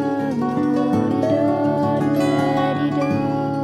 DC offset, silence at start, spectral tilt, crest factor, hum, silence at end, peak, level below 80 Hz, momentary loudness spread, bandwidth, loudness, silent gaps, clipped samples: under 0.1%; 0 s; -7.5 dB/octave; 12 dB; none; 0 s; -6 dBFS; -52 dBFS; 3 LU; 12.5 kHz; -19 LUFS; none; under 0.1%